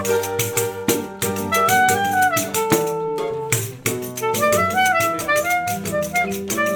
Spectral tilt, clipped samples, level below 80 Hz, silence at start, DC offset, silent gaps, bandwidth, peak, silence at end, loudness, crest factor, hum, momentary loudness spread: -3 dB/octave; under 0.1%; -56 dBFS; 0 s; under 0.1%; none; 19 kHz; -2 dBFS; 0 s; -19 LUFS; 18 dB; none; 7 LU